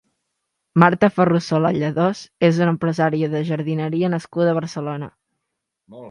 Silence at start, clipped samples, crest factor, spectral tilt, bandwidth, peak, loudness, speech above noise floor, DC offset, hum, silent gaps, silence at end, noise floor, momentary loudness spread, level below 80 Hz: 0.75 s; under 0.1%; 20 dB; -7.5 dB/octave; 10 kHz; 0 dBFS; -19 LUFS; 60 dB; under 0.1%; none; none; 0 s; -79 dBFS; 9 LU; -60 dBFS